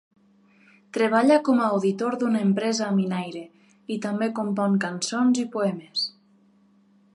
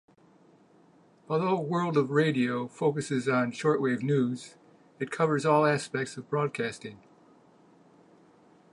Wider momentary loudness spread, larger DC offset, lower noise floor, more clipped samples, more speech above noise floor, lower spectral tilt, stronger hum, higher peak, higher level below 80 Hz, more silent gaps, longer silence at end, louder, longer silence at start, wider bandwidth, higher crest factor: about the same, 12 LU vs 11 LU; neither; about the same, -59 dBFS vs -60 dBFS; neither; first, 36 dB vs 32 dB; about the same, -5.5 dB/octave vs -6.5 dB/octave; neither; about the same, -8 dBFS vs -10 dBFS; about the same, -78 dBFS vs -76 dBFS; neither; second, 1.05 s vs 1.75 s; first, -24 LUFS vs -28 LUFS; second, 0.95 s vs 1.3 s; about the same, 11.5 kHz vs 11 kHz; about the same, 18 dB vs 20 dB